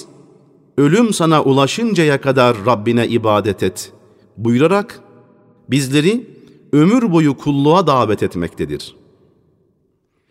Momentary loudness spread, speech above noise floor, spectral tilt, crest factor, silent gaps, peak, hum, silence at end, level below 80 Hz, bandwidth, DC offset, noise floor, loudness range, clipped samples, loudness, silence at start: 11 LU; 49 dB; -6 dB/octave; 16 dB; none; 0 dBFS; none; 1.4 s; -52 dBFS; 16 kHz; under 0.1%; -63 dBFS; 4 LU; under 0.1%; -15 LUFS; 0 s